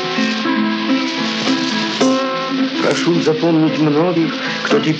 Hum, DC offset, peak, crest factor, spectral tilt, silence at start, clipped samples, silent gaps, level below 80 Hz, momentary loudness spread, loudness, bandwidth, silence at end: none; under 0.1%; 0 dBFS; 14 dB; -5 dB/octave; 0 s; under 0.1%; none; -76 dBFS; 4 LU; -16 LUFS; 8.8 kHz; 0 s